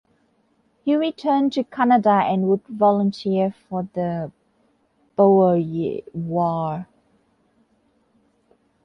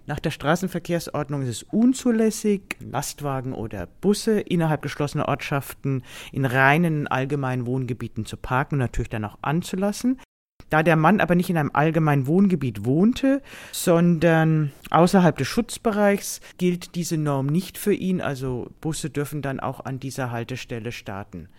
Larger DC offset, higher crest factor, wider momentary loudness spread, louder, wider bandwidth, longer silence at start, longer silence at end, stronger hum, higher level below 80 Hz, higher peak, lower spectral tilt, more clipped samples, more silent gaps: neither; about the same, 18 dB vs 20 dB; about the same, 13 LU vs 12 LU; about the same, -21 LUFS vs -23 LUFS; second, 7 kHz vs 17 kHz; first, 0.85 s vs 0.1 s; first, 2 s vs 0.1 s; neither; second, -64 dBFS vs -46 dBFS; about the same, -4 dBFS vs -2 dBFS; first, -8.5 dB/octave vs -6 dB/octave; neither; second, none vs 10.25-10.60 s